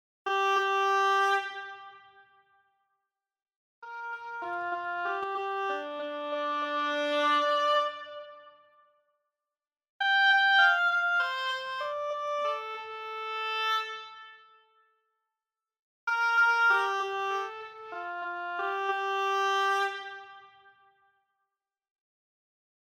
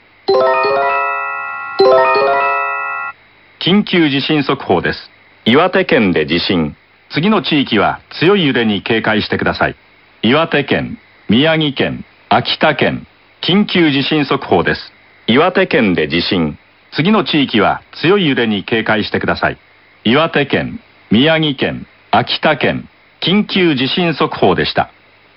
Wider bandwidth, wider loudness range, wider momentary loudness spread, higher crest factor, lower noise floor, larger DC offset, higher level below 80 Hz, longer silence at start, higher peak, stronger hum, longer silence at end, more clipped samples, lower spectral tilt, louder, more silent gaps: first, 16.5 kHz vs 6 kHz; first, 10 LU vs 1 LU; first, 18 LU vs 9 LU; first, 20 dB vs 14 dB; first, under -90 dBFS vs -45 dBFS; neither; second, -88 dBFS vs -46 dBFS; about the same, 0.25 s vs 0.3 s; second, -12 dBFS vs 0 dBFS; neither; first, 2.35 s vs 0.5 s; neither; second, -0.5 dB/octave vs -8.5 dB/octave; second, -28 LUFS vs -14 LUFS; first, 3.56-3.82 s, 9.89-9.99 s, 15.79-16.07 s vs none